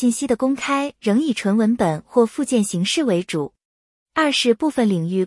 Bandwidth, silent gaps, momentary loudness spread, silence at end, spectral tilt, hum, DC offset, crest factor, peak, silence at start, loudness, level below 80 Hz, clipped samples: 12 kHz; 3.65-4.06 s; 4 LU; 0 s; -5 dB/octave; none; under 0.1%; 16 dB; -4 dBFS; 0 s; -20 LUFS; -58 dBFS; under 0.1%